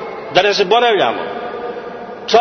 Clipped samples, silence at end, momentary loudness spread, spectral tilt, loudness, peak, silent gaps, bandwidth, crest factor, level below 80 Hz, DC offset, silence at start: under 0.1%; 0 s; 15 LU; -3.5 dB/octave; -15 LUFS; 0 dBFS; none; 6.6 kHz; 16 dB; -56 dBFS; under 0.1%; 0 s